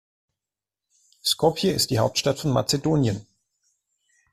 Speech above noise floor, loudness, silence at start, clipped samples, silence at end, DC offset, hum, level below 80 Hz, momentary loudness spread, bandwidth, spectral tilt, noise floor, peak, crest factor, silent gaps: 66 dB; -23 LUFS; 1.25 s; under 0.1%; 1.1 s; under 0.1%; none; -54 dBFS; 5 LU; 15.5 kHz; -4.5 dB/octave; -89 dBFS; -6 dBFS; 20 dB; none